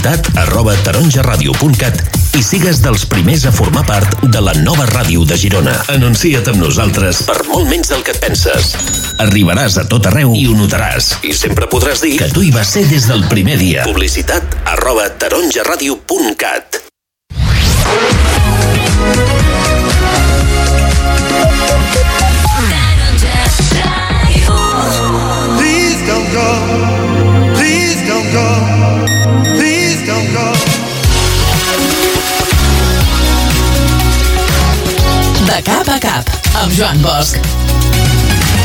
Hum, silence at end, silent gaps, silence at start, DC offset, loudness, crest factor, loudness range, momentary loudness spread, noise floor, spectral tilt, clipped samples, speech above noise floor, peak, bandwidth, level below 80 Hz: none; 0 s; none; 0 s; under 0.1%; -10 LUFS; 10 dB; 1 LU; 3 LU; -31 dBFS; -4.5 dB/octave; under 0.1%; 21 dB; 0 dBFS; 18 kHz; -16 dBFS